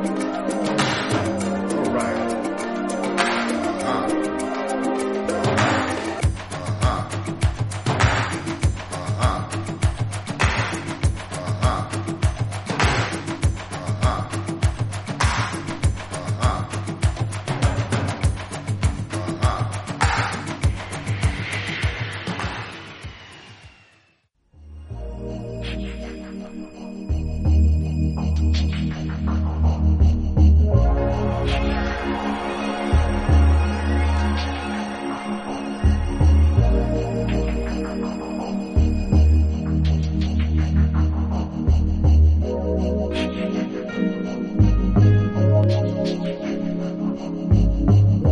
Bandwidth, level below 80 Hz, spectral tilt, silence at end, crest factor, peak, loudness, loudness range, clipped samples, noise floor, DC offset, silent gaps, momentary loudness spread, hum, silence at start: 11.5 kHz; -26 dBFS; -6.5 dB/octave; 0 s; 18 dB; -4 dBFS; -22 LUFS; 6 LU; under 0.1%; -63 dBFS; under 0.1%; none; 10 LU; none; 0 s